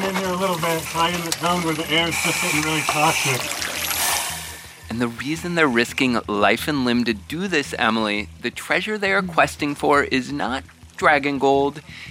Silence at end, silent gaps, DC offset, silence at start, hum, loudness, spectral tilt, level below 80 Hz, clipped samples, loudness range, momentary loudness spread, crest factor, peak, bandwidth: 0 s; none; under 0.1%; 0 s; none; -20 LUFS; -3.5 dB/octave; -48 dBFS; under 0.1%; 1 LU; 8 LU; 20 dB; -2 dBFS; 16.5 kHz